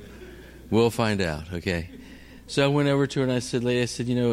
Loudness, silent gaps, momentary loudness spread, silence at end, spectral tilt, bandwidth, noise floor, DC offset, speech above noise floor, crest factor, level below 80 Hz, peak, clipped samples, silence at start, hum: -25 LUFS; none; 22 LU; 0 s; -5.5 dB/octave; 15.5 kHz; -45 dBFS; under 0.1%; 21 dB; 16 dB; -48 dBFS; -10 dBFS; under 0.1%; 0 s; none